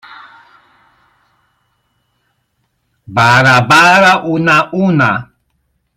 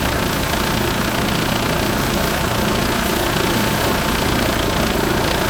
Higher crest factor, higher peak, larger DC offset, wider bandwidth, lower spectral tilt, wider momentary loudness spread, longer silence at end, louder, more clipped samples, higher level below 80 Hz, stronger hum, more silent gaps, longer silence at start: about the same, 14 dB vs 14 dB; about the same, 0 dBFS vs -2 dBFS; second, under 0.1% vs 0.3%; second, 16 kHz vs over 20 kHz; about the same, -5 dB/octave vs -4 dB/octave; first, 8 LU vs 1 LU; first, 0.75 s vs 0 s; first, -9 LUFS vs -18 LUFS; neither; second, -50 dBFS vs -28 dBFS; neither; neither; about the same, 0.1 s vs 0 s